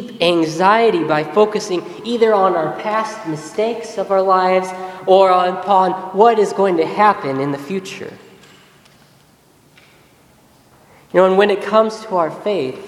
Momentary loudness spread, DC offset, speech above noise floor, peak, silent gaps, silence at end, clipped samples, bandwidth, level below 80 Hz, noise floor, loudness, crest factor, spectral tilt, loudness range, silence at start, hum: 12 LU; under 0.1%; 36 dB; 0 dBFS; none; 0 s; under 0.1%; 13 kHz; -64 dBFS; -51 dBFS; -16 LUFS; 16 dB; -5.5 dB/octave; 7 LU; 0 s; none